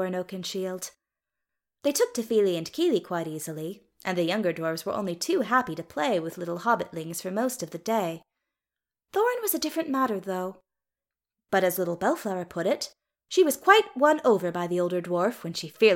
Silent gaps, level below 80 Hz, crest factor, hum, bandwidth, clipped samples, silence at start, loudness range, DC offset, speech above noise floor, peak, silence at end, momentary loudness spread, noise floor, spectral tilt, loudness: none; -72 dBFS; 24 dB; none; 17 kHz; under 0.1%; 0 s; 6 LU; under 0.1%; over 64 dB; -4 dBFS; 0 s; 11 LU; under -90 dBFS; -4 dB/octave; -27 LUFS